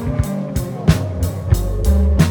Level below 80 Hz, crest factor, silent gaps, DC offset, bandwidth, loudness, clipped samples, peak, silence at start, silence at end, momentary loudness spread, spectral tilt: -20 dBFS; 16 dB; none; under 0.1%; over 20 kHz; -18 LUFS; under 0.1%; 0 dBFS; 0 s; 0 s; 7 LU; -7 dB/octave